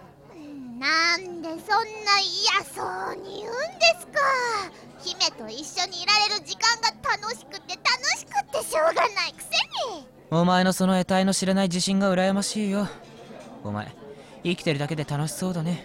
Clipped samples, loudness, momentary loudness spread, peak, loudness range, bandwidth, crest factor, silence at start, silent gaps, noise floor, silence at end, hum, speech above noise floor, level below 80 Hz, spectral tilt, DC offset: under 0.1%; -24 LUFS; 15 LU; -8 dBFS; 3 LU; 16 kHz; 18 dB; 0 s; none; -45 dBFS; 0 s; none; 20 dB; -60 dBFS; -3.5 dB/octave; under 0.1%